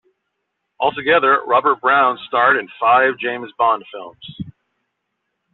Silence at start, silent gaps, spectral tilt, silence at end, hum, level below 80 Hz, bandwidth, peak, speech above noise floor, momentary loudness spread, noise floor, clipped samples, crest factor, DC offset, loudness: 0.8 s; none; -1 dB/octave; 1.05 s; none; -60 dBFS; 4.2 kHz; -2 dBFS; 58 dB; 20 LU; -75 dBFS; under 0.1%; 16 dB; under 0.1%; -16 LUFS